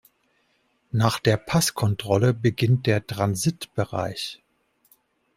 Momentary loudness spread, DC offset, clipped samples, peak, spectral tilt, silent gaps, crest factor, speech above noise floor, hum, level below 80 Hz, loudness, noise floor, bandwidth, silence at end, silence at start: 9 LU; under 0.1%; under 0.1%; -4 dBFS; -5.5 dB/octave; none; 20 dB; 45 dB; none; -56 dBFS; -24 LUFS; -68 dBFS; 16 kHz; 1 s; 0.95 s